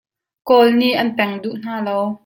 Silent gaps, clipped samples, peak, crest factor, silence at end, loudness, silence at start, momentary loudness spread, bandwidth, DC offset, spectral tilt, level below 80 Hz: none; under 0.1%; -2 dBFS; 16 dB; 0.1 s; -17 LUFS; 0.45 s; 13 LU; 17 kHz; under 0.1%; -6 dB/octave; -64 dBFS